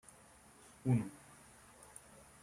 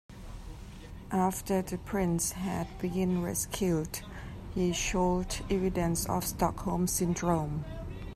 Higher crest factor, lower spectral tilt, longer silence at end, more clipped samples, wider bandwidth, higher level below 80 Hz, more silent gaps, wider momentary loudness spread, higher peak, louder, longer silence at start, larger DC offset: about the same, 22 dB vs 18 dB; first, -7.5 dB/octave vs -5 dB/octave; first, 1.25 s vs 0 s; neither; second, 13.5 kHz vs 15.5 kHz; second, -72 dBFS vs -44 dBFS; neither; first, 24 LU vs 15 LU; second, -22 dBFS vs -14 dBFS; second, -38 LUFS vs -31 LUFS; first, 0.85 s vs 0.1 s; neither